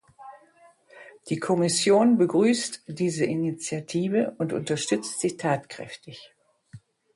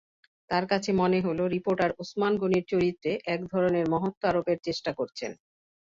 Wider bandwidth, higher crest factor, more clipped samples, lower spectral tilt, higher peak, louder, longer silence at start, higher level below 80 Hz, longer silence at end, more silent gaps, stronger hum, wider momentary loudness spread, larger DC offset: first, 11.5 kHz vs 7.6 kHz; about the same, 16 dB vs 16 dB; neither; second, -4.5 dB/octave vs -6.5 dB/octave; about the same, -10 dBFS vs -10 dBFS; first, -25 LUFS vs -28 LUFS; second, 0.2 s vs 0.5 s; second, -68 dBFS vs -60 dBFS; second, 0.35 s vs 0.65 s; second, none vs 4.17-4.21 s; neither; first, 19 LU vs 7 LU; neither